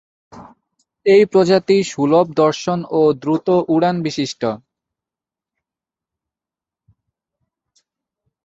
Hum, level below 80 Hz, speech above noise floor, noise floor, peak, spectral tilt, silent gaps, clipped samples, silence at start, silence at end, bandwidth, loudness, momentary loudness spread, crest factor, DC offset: none; -62 dBFS; 73 dB; -89 dBFS; -2 dBFS; -6 dB/octave; none; under 0.1%; 0.35 s; 3.9 s; 8 kHz; -16 LUFS; 9 LU; 18 dB; under 0.1%